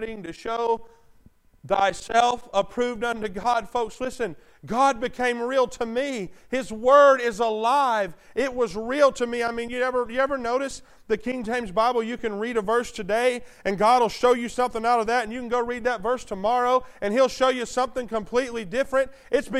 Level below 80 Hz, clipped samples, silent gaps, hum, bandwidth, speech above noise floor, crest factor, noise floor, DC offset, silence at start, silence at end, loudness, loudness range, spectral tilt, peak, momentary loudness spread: -50 dBFS; under 0.1%; none; none; 13.5 kHz; 33 dB; 20 dB; -56 dBFS; under 0.1%; 0 s; 0 s; -24 LUFS; 4 LU; -4 dB/octave; -4 dBFS; 9 LU